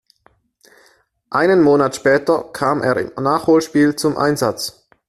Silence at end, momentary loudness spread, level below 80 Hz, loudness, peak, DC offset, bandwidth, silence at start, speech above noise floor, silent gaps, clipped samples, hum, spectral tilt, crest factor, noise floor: 0.4 s; 7 LU; -54 dBFS; -16 LUFS; -2 dBFS; under 0.1%; 14.5 kHz; 1.3 s; 42 dB; none; under 0.1%; none; -5.5 dB/octave; 14 dB; -57 dBFS